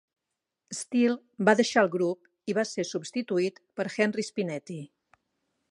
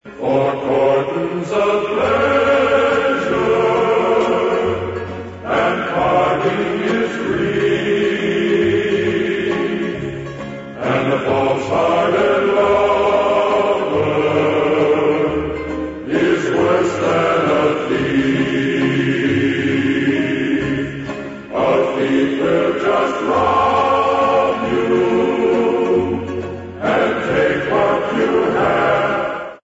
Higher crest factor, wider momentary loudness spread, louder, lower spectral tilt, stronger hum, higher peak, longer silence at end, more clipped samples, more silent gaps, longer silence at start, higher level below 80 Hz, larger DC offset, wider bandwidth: first, 24 dB vs 14 dB; first, 14 LU vs 7 LU; second, -28 LUFS vs -16 LUFS; second, -4.5 dB/octave vs -6.5 dB/octave; neither; about the same, -6 dBFS vs -4 dBFS; first, 0.85 s vs 0.05 s; neither; neither; first, 0.7 s vs 0.05 s; second, -80 dBFS vs -46 dBFS; neither; first, 11.5 kHz vs 8 kHz